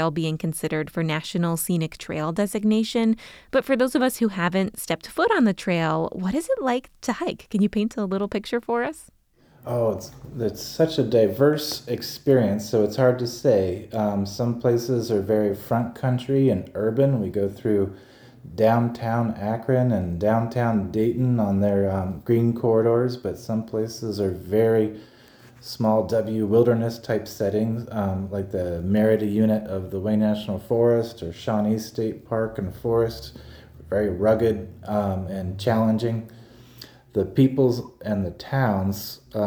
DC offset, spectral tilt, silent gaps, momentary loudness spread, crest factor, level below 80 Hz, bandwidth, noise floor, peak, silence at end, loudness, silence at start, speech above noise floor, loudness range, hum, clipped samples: under 0.1%; -6.5 dB/octave; none; 9 LU; 16 dB; -52 dBFS; over 20 kHz; -54 dBFS; -6 dBFS; 0 s; -23 LUFS; 0 s; 31 dB; 3 LU; none; under 0.1%